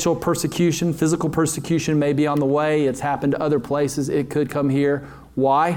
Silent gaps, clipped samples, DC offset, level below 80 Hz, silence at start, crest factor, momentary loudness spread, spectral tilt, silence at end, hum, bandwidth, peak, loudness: none; under 0.1%; under 0.1%; -50 dBFS; 0 s; 14 dB; 4 LU; -6 dB/octave; 0 s; none; 18 kHz; -6 dBFS; -21 LUFS